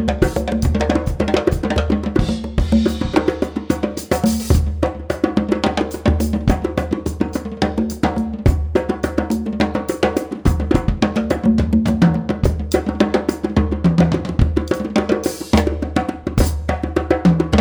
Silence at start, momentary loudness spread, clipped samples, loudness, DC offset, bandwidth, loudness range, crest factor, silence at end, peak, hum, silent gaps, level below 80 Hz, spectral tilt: 0 s; 5 LU; under 0.1%; -19 LUFS; under 0.1%; over 20 kHz; 2 LU; 16 dB; 0 s; -2 dBFS; none; none; -24 dBFS; -7 dB/octave